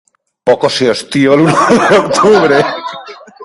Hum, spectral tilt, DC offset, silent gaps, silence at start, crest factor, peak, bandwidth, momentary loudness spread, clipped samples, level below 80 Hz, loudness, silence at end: none; -5 dB/octave; under 0.1%; none; 0.45 s; 10 dB; 0 dBFS; 11.5 kHz; 11 LU; 0.1%; -50 dBFS; -10 LUFS; 0 s